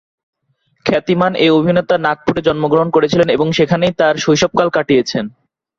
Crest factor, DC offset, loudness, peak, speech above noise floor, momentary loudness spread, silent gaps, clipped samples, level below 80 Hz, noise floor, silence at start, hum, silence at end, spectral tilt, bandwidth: 14 dB; under 0.1%; -14 LUFS; 0 dBFS; 49 dB; 5 LU; none; under 0.1%; -48 dBFS; -62 dBFS; 0.85 s; none; 0.5 s; -5.5 dB/octave; 7.6 kHz